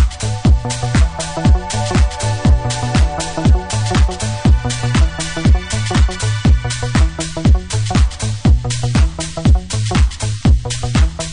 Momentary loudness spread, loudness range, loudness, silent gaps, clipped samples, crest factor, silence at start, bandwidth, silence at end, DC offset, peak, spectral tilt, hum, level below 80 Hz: 3 LU; 0 LU; -16 LUFS; none; under 0.1%; 12 dB; 0 s; 11 kHz; 0 s; under 0.1%; -2 dBFS; -5.5 dB/octave; none; -16 dBFS